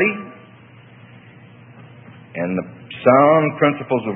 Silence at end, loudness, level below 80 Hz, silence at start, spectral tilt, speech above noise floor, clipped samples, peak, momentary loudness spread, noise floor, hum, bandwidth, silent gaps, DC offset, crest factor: 0 s; -17 LUFS; -66 dBFS; 0 s; -10.5 dB/octave; 29 dB; under 0.1%; 0 dBFS; 21 LU; -45 dBFS; none; 3.9 kHz; none; under 0.1%; 20 dB